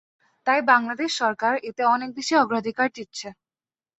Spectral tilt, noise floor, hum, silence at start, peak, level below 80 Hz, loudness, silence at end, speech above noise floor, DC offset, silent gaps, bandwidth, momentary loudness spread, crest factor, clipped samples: -3 dB/octave; under -90 dBFS; none; 0.45 s; -4 dBFS; -72 dBFS; -22 LUFS; 0.65 s; over 67 dB; under 0.1%; none; 8.4 kHz; 15 LU; 20 dB; under 0.1%